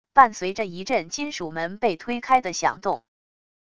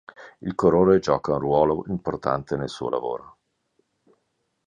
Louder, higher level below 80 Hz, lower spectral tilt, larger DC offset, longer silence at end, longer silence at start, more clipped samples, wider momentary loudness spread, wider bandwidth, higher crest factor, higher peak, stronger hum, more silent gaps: about the same, -24 LUFS vs -23 LUFS; second, -60 dBFS vs -50 dBFS; second, -3.5 dB/octave vs -7.5 dB/octave; first, 0.5% vs under 0.1%; second, 0.8 s vs 1.4 s; about the same, 0.15 s vs 0.2 s; neither; about the same, 11 LU vs 13 LU; about the same, 10 kHz vs 9.6 kHz; about the same, 22 dB vs 20 dB; about the same, -2 dBFS vs -4 dBFS; neither; neither